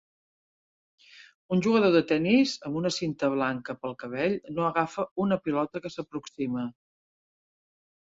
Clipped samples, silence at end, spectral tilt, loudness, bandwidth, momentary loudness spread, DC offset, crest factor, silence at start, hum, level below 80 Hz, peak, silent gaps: under 0.1%; 1.5 s; -6 dB/octave; -27 LUFS; 7.8 kHz; 13 LU; under 0.1%; 20 dB; 1.15 s; none; -66 dBFS; -10 dBFS; 1.34-1.49 s, 5.11-5.16 s